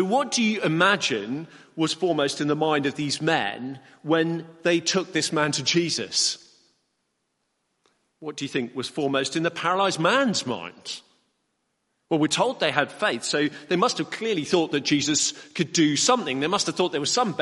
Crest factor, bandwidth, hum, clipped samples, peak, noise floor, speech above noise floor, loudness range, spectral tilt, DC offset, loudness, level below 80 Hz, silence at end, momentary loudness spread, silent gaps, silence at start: 22 dB; 11.5 kHz; none; under 0.1%; -2 dBFS; -75 dBFS; 51 dB; 5 LU; -3.5 dB/octave; under 0.1%; -23 LUFS; -70 dBFS; 0 s; 11 LU; none; 0 s